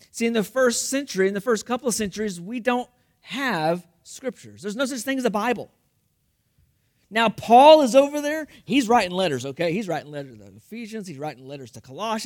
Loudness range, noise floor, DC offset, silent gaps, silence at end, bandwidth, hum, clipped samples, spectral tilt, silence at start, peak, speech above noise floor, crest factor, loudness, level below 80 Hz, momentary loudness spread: 10 LU; -69 dBFS; under 0.1%; none; 0 s; 18 kHz; none; under 0.1%; -4 dB/octave; 0.15 s; -2 dBFS; 47 dB; 20 dB; -21 LUFS; -62 dBFS; 20 LU